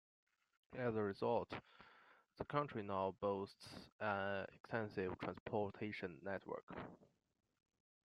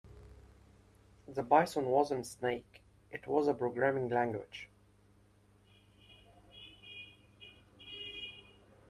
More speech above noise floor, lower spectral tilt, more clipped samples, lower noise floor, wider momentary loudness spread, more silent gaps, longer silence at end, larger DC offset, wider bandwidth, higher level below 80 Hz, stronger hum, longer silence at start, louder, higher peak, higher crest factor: second, 25 dB vs 33 dB; first, -7 dB/octave vs -5.5 dB/octave; neither; first, -70 dBFS vs -66 dBFS; second, 14 LU vs 26 LU; first, 3.92-3.99 s, 4.60-4.64 s, 5.40-5.46 s, 6.63-6.67 s vs none; first, 1 s vs 0.5 s; neither; second, 12 kHz vs 13.5 kHz; second, -78 dBFS vs -66 dBFS; second, none vs 50 Hz at -65 dBFS; first, 0.7 s vs 0.05 s; second, -45 LUFS vs -34 LUFS; second, -24 dBFS vs -12 dBFS; about the same, 20 dB vs 24 dB